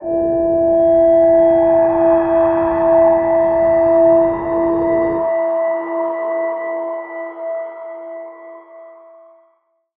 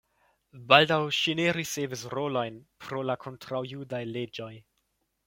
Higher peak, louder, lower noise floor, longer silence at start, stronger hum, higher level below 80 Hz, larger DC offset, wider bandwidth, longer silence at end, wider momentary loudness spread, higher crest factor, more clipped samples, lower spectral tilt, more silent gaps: about the same, -4 dBFS vs -2 dBFS; first, -14 LUFS vs -28 LUFS; second, -61 dBFS vs -76 dBFS; second, 0 s vs 0.55 s; neither; first, -46 dBFS vs -68 dBFS; neither; second, 3.5 kHz vs 16.5 kHz; first, 1.05 s vs 0.65 s; about the same, 15 LU vs 17 LU; second, 12 dB vs 26 dB; neither; first, -11 dB/octave vs -4 dB/octave; neither